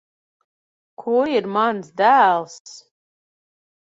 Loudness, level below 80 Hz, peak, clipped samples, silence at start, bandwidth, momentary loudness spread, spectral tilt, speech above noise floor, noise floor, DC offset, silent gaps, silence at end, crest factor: -18 LUFS; -72 dBFS; -4 dBFS; under 0.1%; 1 s; 7.8 kHz; 19 LU; -4.5 dB/octave; over 72 dB; under -90 dBFS; under 0.1%; 2.60-2.65 s; 1.2 s; 18 dB